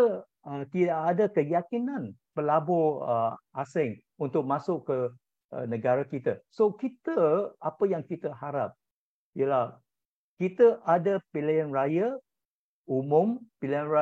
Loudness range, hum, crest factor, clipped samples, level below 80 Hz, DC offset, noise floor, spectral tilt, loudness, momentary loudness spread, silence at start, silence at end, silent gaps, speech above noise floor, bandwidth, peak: 3 LU; none; 18 dB; under 0.1%; -82 dBFS; under 0.1%; under -90 dBFS; -9 dB/octave; -28 LUFS; 11 LU; 0 s; 0 s; 5.45-5.49 s, 8.91-9.33 s, 10.05-10.37 s, 12.45-12.85 s; over 63 dB; 7.8 kHz; -10 dBFS